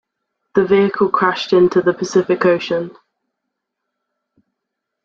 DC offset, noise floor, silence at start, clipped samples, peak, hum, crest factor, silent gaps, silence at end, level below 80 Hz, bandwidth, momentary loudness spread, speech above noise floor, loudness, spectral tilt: under 0.1%; -79 dBFS; 0.55 s; under 0.1%; 0 dBFS; none; 16 dB; none; 2.15 s; -58 dBFS; 7.6 kHz; 8 LU; 64 dB; -16 LUFS; -6 dB/octave